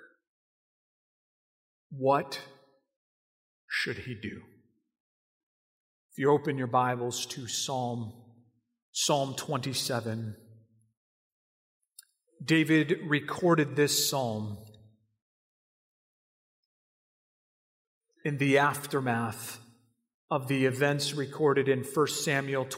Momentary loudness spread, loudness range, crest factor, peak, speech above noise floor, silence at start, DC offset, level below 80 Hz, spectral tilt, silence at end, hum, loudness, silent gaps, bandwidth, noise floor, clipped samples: 15 LU; 9 LU; 20 dB; -12 dBFS; 37 dB; 1.9 s; under 0.1%; -76 dBFS; -4.5 dB/octave; 0 s; none; -29 LUFS; 2.96-3.68 s, 5.00-6.09 s, 8.82-8.93 s, 10.97-11.80 s, 15.22-18.01 s, 20.14-20.28 s; 16 kHz; -65 dBFS; under 0.1%